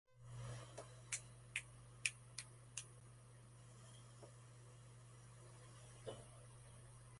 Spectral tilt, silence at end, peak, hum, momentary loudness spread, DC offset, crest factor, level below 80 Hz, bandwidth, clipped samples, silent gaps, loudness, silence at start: -2.5 dB/octave; 0 s; -18 dBFS; none; 16 LU; under 0.1%; 38 dB; -72 dBFS; 11.5 kHz; under 0.1%; none; -53 LUFS; 0.05 s